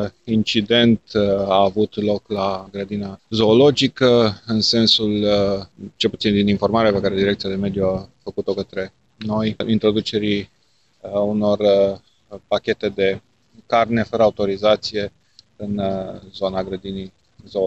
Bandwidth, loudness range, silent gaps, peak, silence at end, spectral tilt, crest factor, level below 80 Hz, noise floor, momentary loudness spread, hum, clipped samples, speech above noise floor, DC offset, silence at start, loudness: 8.2 kHz; 5 LU; none; -4 dBFS; 0 s; -6 dB/octave; 16 dB; -50 dBFS; -61 dBFS; 13 LU; none; under 0.1%; 43 dB; 0.1%; 0 s; -19 LUFS